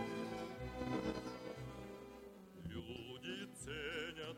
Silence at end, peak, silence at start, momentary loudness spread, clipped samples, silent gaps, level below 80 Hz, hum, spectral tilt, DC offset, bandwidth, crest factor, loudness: 0 s; -30 dBFS; 0 s; 11 LU; under 0.1%; none; -62 dBFS; none; -5 dB/octave; under 0.1%; 17 kHz; 18 dB; -47 LUFS